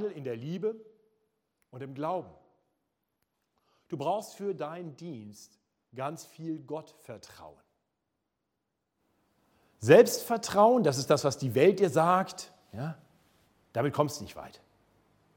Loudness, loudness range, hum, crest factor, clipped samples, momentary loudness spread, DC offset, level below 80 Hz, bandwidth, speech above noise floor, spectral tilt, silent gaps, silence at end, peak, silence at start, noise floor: -28 LUFS; 19 LU; none; 24 dB; under 0.1%; 24 LU; under 0.1%; -72 dBFS; 17 kHz; 55 dB; -5.5 dB/octave; none; 0.9 s; -6 dBFS; 0 s; -83 dBFS